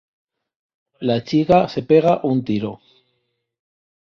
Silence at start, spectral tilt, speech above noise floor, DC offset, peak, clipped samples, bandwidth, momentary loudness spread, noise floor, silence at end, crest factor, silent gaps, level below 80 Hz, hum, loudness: 1 s; -8 dB/octave; 55 dB; under 0.1%; -2 dBFS; under 0.1%; 7 kHz; 10 LU; -72 dBFS; 1.3 s; 18 dB; none; -54 dBFS; none; -18 LUFS